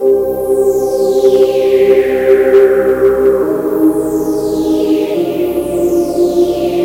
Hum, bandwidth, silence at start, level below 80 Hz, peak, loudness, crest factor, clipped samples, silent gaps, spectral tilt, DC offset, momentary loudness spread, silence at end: none; 16 kHz; 0 s; -40 dBFS; 0 dBFS; -11 LUFS; 10 dB; under 0.1%; none; -6 dB/octave; under 0.1%; 6 LU; 0 s